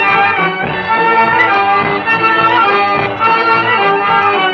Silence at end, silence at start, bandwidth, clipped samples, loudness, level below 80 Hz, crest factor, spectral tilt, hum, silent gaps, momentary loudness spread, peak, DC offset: 0 s; 0 s; 6.8 kHz; under 0.1%; -10 LUFS; -50 dBFS; 12 dB; -6 dB/octave; none; none; 4 LU; 0 dBFS; under 0.1%